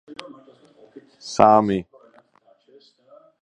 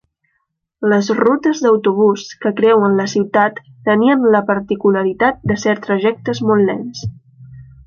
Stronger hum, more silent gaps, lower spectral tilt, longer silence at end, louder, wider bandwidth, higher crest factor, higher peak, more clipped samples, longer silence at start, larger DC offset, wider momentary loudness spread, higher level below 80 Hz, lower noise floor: neither; neither; about the same, -6 dB/octave vs -6 dB/octave; first, 1.6 s vs 0.25 s; second, -18 LUFS vs -15 LUFS; first, 10 kHz vs 7.2 kHz; first, 24 dB vs 14 dB; about the same, 0 dBFS vs -2 dBFS; neither; second, 0.1 s vs 0.8 s; neither; first, 24 LU vs 8 LU; second, -58 dBFS vs -50 dBFS; second, -59 dBFS vs -70 dBFS